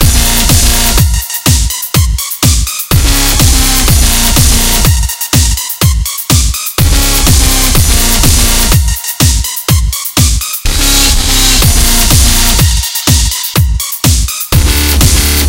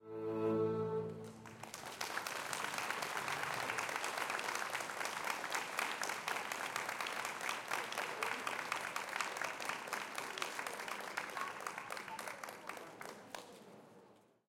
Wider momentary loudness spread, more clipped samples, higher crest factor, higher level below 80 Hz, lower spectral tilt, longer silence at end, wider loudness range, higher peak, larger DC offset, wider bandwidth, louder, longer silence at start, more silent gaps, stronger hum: second, 5 LU vs 11 LU; first, 2% vs under 0.1%; second, 8 dB vs 22 dB; first, -12 dBFS vs -82 dBFS; about the same, -3 dB/octave vs -2.5 dB/octave; second, 0 s vs 0.3 s; second, 1 LU vs 5 LU; first, 0 dBFS vs -20 dBFS; neither; first, over 20 kHz vs 17 kHz; first, -8 LUFS vs -41 LUFS; about the same, 0 s vs 0 s; neither; neither